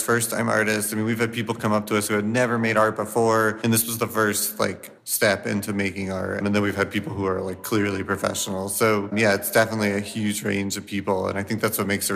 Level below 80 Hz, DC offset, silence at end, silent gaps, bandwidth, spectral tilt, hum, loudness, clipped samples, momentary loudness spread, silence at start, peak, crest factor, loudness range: -62 dBFS; under 0.1%; 0 s; none; 15.5 kHz; -4 dB/octave; none; -23 LUFS; under 0.1%; 6 LU; 0 s; -6 dBFS; 18 dB; 3 LU